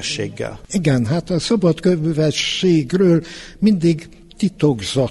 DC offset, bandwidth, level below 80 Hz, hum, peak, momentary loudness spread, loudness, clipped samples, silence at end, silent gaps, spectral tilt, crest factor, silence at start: under 0.1%; 11.5 kHz; -44 dBFS; none; -2 dBFS; 8 LU; -18 LUFS; under 0.1%; 0 s; none; -6 dB/octave; 14 dB; 0 s